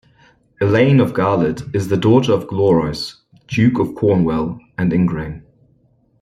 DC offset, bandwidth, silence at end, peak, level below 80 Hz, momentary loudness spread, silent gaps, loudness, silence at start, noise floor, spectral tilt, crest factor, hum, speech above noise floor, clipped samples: under 0.1%; 13.5 kHz; 0.8 s; -2 dBFS; -46 dBFS; 12 LU; none; -17 LUFS; 0.6 s; -57 dBFS; -7.5 dB/octave; 16 dB; none; 42 dB; under 0.1%